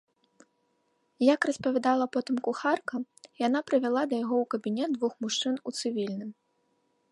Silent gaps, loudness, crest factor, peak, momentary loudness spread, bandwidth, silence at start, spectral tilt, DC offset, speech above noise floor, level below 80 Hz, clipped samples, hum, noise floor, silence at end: none; -29 LUFS; 20 dB; -10 dBFS; 8 LU; 11.5 kHz; 1.2 s; -4 dB/octave; under 0.1%; 45 dB; -78 dBFS; under 0.1%; none; -73 dBFS; 0.8 s